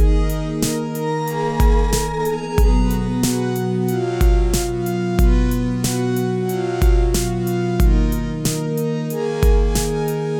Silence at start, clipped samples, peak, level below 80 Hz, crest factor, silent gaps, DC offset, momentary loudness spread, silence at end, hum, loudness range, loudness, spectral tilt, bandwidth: 0 s; under 0.1%; 0 dBFS; -20 dBFS; 16 dB; none; under 0.1%; 5 LU; 0 s; none; 1 LU; -19 LUFS; -6 dB/octave; 17.5 kHz